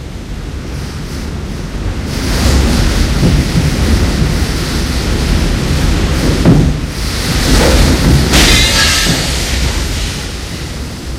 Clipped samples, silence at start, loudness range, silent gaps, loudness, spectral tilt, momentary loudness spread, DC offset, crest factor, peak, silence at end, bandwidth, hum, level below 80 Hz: 0.2%; 0 s; 5 LU; none; -12 LUFS; -4.5 dB/octave; 14 LU; under 0.1%; 12 dB; 0 dBFS; 0 s; 16.5 kHz; none; -16 dBFS